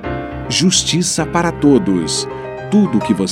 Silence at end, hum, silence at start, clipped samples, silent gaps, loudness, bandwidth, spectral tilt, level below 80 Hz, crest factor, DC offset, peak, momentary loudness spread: 0 s; none; 0 s; under 0.1%; none; -15 LUFS; 15.5 kHz; -4 dB/octave; -38 dBFS; 14 dB; under 0.1%; 0 dBFS; 12 LU